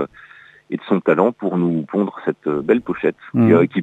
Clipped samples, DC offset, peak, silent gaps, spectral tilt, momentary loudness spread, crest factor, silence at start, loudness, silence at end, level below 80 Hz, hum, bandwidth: under 0.1%; under 0.1%; -2 dBFS; none; -9.5 dB/octave; 9 LU; 18 dB; 0 s; -18 LUFS; 0 s; -60 dBFS; none; 4.1 kHz